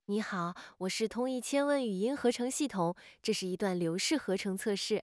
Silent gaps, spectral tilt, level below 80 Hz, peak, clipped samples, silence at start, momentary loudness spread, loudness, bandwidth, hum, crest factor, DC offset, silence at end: none; -4 dB/octave; -74 dBFS; -16 dBFS; under 0.1%; 0.1 s; 5 LU; -33 LUFS; 12 kHz; none; 16 dB; under 0.1%; 0 s